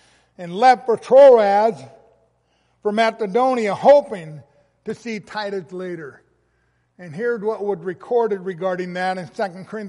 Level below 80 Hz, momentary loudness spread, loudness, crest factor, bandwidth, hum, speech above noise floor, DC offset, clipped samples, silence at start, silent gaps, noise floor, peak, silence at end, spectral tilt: -68 dBFS; 19 LU; -18 LUFS; 16 dB; 10.5 kHz; none; 47 dB; under 0.1%; under 0.1%; 0.4 s; none; -65 dBFS; -4 dBFS; 0 s; -5.5 dB/octave